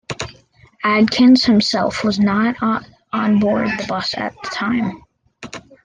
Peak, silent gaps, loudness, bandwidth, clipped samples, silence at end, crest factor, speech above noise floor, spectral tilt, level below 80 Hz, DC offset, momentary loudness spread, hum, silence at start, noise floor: -2 dBFS; none; -17 LUFS; 9.4 kHz; under 0.1%; 0.25 s; 14 dB; 33 dB; -5 dB/octave; -50 dBFS; under 0.1%; 16 LU; none; 0.1 s; -49 dBFS